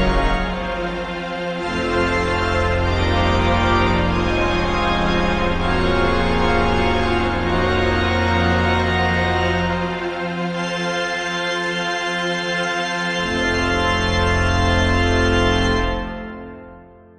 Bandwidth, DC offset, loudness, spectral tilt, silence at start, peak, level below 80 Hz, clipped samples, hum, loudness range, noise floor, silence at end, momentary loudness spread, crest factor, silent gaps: 10.5 kHz; under 0.1%; -19 LUFS; -5.5 dB/octave; 0 s; -4 dBFS; -26 dBFS; under 0.1%; none; 3 LU; -42 dBFS; 0.35 s; 7 LU; 14 dB; none